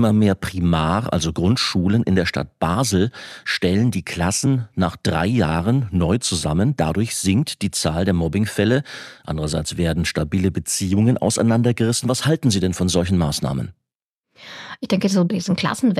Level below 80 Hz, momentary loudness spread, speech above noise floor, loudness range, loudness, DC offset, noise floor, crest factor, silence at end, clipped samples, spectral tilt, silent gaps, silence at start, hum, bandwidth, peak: -40 dBFS; 6 LU; 63 dB; 2 LU; -20 LUFS; under 0.1%; -83 dBFS; 16 dB; 0 s; under 0.1%; -5 dB/octave; 13.95-14.24 s; 0 s; none; 14.5 kHz; -4 dBFS